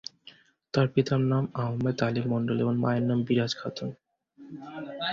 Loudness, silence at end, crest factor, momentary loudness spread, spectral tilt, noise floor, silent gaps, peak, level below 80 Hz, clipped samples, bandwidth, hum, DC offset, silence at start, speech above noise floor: -28 LUFS; 0 s; 18 dB; 14 LU; -7 dB/octave; -55 dBFS; none; -10 dBFS; -62 dBFS; under 0.1%; 7.4 kHz; none; under 0.1%; 0.25 s; 28 dB